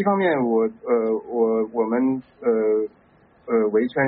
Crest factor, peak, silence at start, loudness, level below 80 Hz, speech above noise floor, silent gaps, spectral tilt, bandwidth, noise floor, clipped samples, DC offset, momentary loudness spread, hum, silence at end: 14 dB; -8 dBFS; 0 s; -22 LUFS; -66 dBFS; 33 dB; none; -6 dB/octave; 4 kHz; -53 dBFS; under 0.1%; under 0.1%; 5 LU; none; 0 s